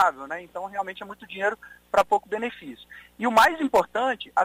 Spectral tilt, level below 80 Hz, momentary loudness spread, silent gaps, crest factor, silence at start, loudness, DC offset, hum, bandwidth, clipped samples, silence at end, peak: -3.5 dB/octave; -60 dBFS; 20 LU; none; 18 dB; 0 s; -24 LUFS; under 0.1%; none; 16 kHz; under 0.1%; 0 s; -6 dBFS